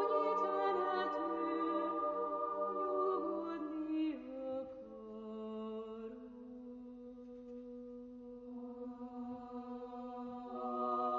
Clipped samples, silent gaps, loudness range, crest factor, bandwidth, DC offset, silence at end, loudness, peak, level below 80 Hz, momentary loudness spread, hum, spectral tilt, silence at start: under 0.1%; none; 13 LU; 16 dB; 7 kHz; under 0.1%; 0 s; -40 LUFS; -24 dBFS; -74 dBFS; 16 LU; none; -4 dB/octave; 0 s